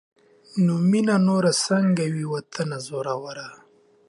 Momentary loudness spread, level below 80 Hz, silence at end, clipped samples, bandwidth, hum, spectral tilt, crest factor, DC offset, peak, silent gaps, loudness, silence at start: 13 LU; -70 dBFS; 0.55 s; under 0.1%; 11.5 kHz; none; -5.5 dB/octave; 14 dB; under 0.1%; -8 dBFS; none; -23 LUFS; 0.55 s